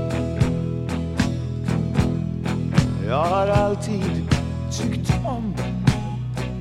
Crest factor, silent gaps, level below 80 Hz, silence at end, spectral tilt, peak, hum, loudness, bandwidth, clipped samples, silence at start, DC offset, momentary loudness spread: 18 dB; none; -34 dBFS; 0 s; -7 dB/octave; -4 dBFS; none; -23 LUFS; 12.5 kHz; under 0.1%; 0 s; under 0.1%; 6 LU